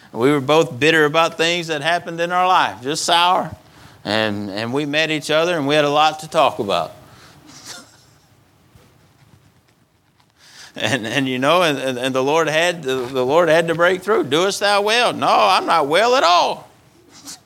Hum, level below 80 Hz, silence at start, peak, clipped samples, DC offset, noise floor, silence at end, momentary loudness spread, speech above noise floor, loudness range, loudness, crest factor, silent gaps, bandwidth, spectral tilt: none; -62 dBFS; 0.15 s; 0 dBFS; under 0.1%; under 0.1%; -58 dBFS; 0.1 s; 9 LU; 41 dB; 9 LU; -17 LUFS; 18 dB; none; 17 kHz; -3.5 dB/octave